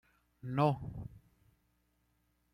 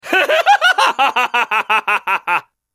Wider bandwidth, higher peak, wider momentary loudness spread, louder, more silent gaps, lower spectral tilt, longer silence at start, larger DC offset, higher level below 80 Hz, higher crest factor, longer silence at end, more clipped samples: second, 10.5 kHz vs 15.5 kHz; second, -18 dBFS vs -2 dBFS; first, 18 LU vs 6 LU; second, -35 LUFS vs -14 LUFS; neither; first, -9 dB/octave vs -0.5 dB/octave; first, 0.45 s vs 0.05 s; neither; first, -62 dBFS vs -68 dBFS; first, 22 dB vs 14 dB; first, 1.35 s vs 0.35 s; neither